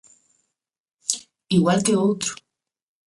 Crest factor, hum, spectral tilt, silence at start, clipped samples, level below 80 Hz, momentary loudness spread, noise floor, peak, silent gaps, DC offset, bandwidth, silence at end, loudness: 24 dB; none; -4.5 dB/octave; 1.1 s; under 0.1%; -62 dBFS; 11 LU; -79 dBFS; 0 dBFS; none; under 0.1%; 11.5 kHz; 0.7 s; -22 LUFS